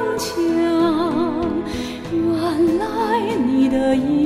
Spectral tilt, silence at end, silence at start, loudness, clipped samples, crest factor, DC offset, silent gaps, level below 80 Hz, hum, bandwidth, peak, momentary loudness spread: -5.5 dB/octave; 0 s; 0 s; -19 LUFS; under 0.1%; 12 dB; under 0.1%; none; -44 dBFS; none; 15 kHz; -6 dBFS; 6 LU